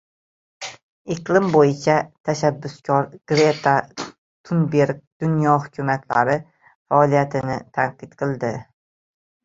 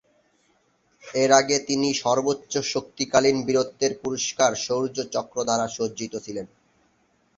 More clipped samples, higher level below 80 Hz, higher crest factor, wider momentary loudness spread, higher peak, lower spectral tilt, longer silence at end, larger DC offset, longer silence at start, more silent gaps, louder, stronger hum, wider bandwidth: neither; about the same, -58 dBFS vs -62 dBFS; about the same, 20 dB vs 22 dB; first, 16 LU vs 13 LU; about the same, 0 dBFS vs -2 dBFS; first, -6.5 dB/octave vs -3 dB/octave; about the same, 0.85 s vs 0.9 s; neither; second, 0.6 s vs 1.05 s; first, 0.83-1.05 s, 2.20-2.24 s, 4.18-4.44 s, 5.07-5.20 s, 6.75-6.85 s vs none; first, -20 LUFS vs -23 LUFS; neither; about the same, 7.8 kHz vs 8 kHz